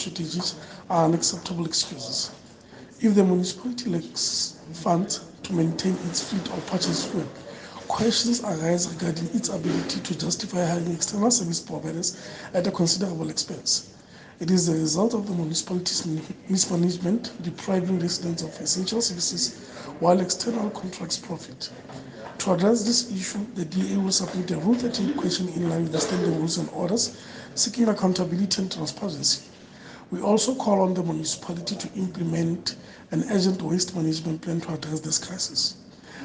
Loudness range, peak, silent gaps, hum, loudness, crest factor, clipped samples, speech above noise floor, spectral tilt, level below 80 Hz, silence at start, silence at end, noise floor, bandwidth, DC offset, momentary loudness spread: 2 LU; -6 dBFS; none; none; -25 LUFS; 20 dB; under 0.1%; 21 dB; -4 dB/octave; -62 dBFS; 0 s; 0 s; -46 dBFS; 10 kHz; under 0.1%; 10 LU